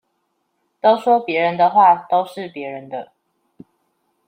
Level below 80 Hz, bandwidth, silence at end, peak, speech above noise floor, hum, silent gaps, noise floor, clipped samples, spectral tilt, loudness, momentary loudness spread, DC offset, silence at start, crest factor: -74 dBFS; 9.8 kHz; 1.25 s; -2 dBFS; 54 dB; none; none; -70 dBFS; under 0.1%; -6 dB/octave; -16 LUFS; 17 LU; under 0.1%; 0.85 s; 18 dB